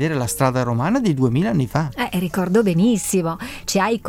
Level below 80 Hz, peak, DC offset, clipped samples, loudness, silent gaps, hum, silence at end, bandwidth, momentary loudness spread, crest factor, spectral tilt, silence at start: -46 dBFS; -4 dBFS; under 0.1%; under 0.1%; -19 LUFS; none; none; 0 s; 17 kHz; 5 LU; 16 dB; -5.5 dB/octave; 0 s